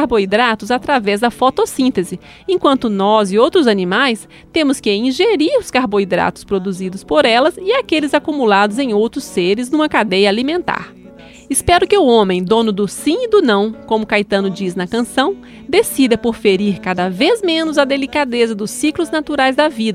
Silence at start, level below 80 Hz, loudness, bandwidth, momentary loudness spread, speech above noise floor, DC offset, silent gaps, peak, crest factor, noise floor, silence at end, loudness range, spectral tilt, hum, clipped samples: 0 s; -44 dBFS; -15 LUFS; 15.5 kHz; 7 LU; 24 dB; under 0.1%; none; 0 dBFS; 14 dB; -38 dBFS; 0 s; 2 LU; -4.5 dB/octave; none; under 0.1%